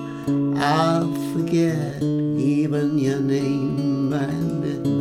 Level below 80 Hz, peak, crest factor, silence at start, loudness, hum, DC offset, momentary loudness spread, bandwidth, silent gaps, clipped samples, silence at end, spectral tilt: -56 dBFS; -6 dBFS; 14 dB; 0 s; -22 LUFS; none; under 0.1%; 5 LU; 14.5 kHz; none; under 0.1%; 0 s; -7 dB/octave